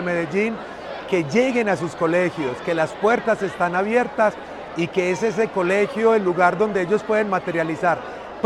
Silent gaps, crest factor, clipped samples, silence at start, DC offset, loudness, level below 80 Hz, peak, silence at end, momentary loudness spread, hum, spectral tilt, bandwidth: none; 16 dB; under 0.1%; 0 s; under 0.1%; -21 LUFS; -56 dBFS; -4 dBFS; 0 s; 8 LU; none; -6 dB/octave; 11.5 kHz